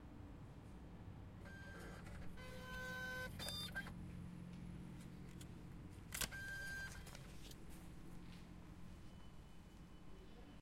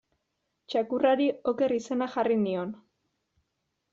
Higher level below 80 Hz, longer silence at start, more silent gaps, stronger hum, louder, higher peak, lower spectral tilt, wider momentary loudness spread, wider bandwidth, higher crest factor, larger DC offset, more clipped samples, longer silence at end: first, -60 dBFS vs -74 dBFS; second, 0 s vs 0.7 s; neither; neither; second, -52 LUFS vs -28 LUFS; second, -24 dBFS vs -10 dBFS; about the same, -3.5 dB/octave vs -4.5 dB/octave; first, 14 LU vs 9 LU; first, 16 kHz vs 7.6 kHz; first, 28 dB vs 20 dB; neither; neither; second, 0 s vs 1.15 s